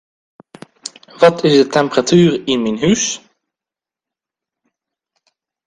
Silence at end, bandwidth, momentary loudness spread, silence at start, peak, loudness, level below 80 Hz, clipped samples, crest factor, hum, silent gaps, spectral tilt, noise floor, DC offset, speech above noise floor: 2.5 s; 10.5 kHz; 20 LU; 0.85 s; 0 dBFS; -13 LUFS; -54 dBFS; under 0.1%; 18 dB; none; none; -4.5 dB/octave; -88 dBFS; under 0.1%; 75 dB